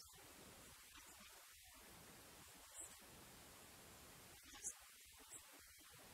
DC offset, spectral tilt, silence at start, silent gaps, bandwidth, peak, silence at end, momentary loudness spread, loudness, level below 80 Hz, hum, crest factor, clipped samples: under 0.1%; -1.5 dB/octave; 0 s; none; 16 kHz; -36 dBFS; 0 s; 10 LU; -58 LUFS; -76 dBFS; none; 26 dB; under 0.1%